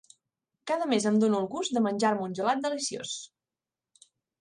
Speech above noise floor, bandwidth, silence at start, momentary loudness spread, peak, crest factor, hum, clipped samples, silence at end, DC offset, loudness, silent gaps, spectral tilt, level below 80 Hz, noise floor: over 62 dB; 11 kHz; 0.65 s; 12 LU; -12 dBFS; 18 dB; none; under 0.1%; 1.15 s; under 0.1%; -28 LUFS; none; -4.5 dB/octave; -76 dBFS; under -90 dBFS